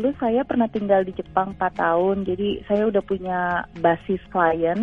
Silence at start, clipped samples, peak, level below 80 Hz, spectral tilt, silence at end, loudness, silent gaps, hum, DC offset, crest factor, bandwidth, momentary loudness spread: 0 s; under 0.1%; -4 dBFS; -48 dBFS; -8.5 dB/octave; 0 s; -22 LUFS; none; none; under 0.1%; 18 dB; 5.6 kHz; 5 LU